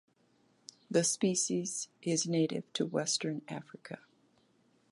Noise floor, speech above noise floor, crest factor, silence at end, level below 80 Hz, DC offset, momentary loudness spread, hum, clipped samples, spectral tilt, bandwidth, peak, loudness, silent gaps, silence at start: -70 dBFS; 37 dB; 20 dB; 0.95 s; -82 dBFS; under 0.1%; 18 LU; none; under 0.1%; -3.5 dB/octave; 11.5 kHz; -16 dBFS; -33 LUFS; none; 0.9 s